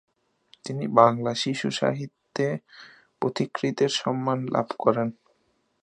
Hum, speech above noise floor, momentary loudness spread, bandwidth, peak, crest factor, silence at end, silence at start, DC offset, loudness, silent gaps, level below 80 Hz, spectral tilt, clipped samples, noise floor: none; 45 dB; 14 LU; 11 kHz; -2 dBFS; 24 dB; 0.7 s; 0.65 s; under 0.1%; -25 LUFS; none; -70 dBFS; -5.5 dB/octave; under 0.1%; -70 dBFS